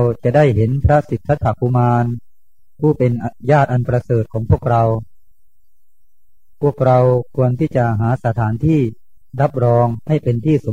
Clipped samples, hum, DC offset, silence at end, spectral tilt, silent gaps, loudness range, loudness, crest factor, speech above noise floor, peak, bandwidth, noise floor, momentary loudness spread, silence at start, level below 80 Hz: under 0.1%; none; 1%; 0 s; -9.5 dB/octave; none; 2 LU; -16 LUFS; 16 dB; 47 dB; 0 dBFS; 7.4 kHz; -62 dBFS; 6 LU; 0 s; -36 dBFS